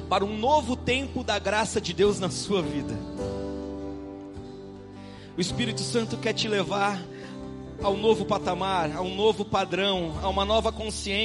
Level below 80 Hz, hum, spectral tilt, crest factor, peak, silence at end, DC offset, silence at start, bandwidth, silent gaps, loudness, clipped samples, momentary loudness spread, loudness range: -44 dBFS; none; -4.5 dB/octave; 18 dB; -8 dBFS; 0 s; under 0.1%; 0 s; 11.5 kHz; none; -27 LUFS; under 0.1%; 15 LU; 7 LU